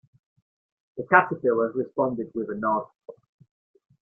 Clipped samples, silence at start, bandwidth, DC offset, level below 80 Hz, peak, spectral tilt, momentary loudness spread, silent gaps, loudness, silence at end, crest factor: under 0.1%; 0.95 s; 3.5 kHz; under 0.1%; -70 dBFS; -2 dBFS; -10.5 dB/octave; 17 LU; none; -24 LUFS; 0.95 s; 24 dB